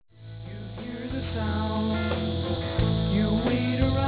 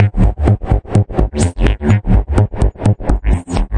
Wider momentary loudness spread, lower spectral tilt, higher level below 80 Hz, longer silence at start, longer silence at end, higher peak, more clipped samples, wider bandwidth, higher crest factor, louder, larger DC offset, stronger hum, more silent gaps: first, 14 LU vs 4 LU; first, -11 dB/octave vs -7.5 dB/octave; second, -36 dBFS vs -16 dBFS; first, 0.15 s vs 0 s; about the same, 0 s vs 0 s; second, -10 dBFS vs 0 dBFS; neither; second, 4 kHz vs 10 kHz; about the same, 16 dB vs 12 dB; second, -27 LUFS vs -15 LUFS; neither; neither; neither